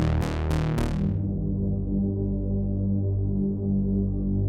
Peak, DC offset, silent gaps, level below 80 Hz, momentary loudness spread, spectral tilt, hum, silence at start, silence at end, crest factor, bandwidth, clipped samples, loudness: -12 dBFS; under 0.1%; none; -32 dBFS; 2 LU; -8.5 dB/octave; none; 0 s; 0 s; 14 dB; 11 kHz; under 0.1%; -27 LUFS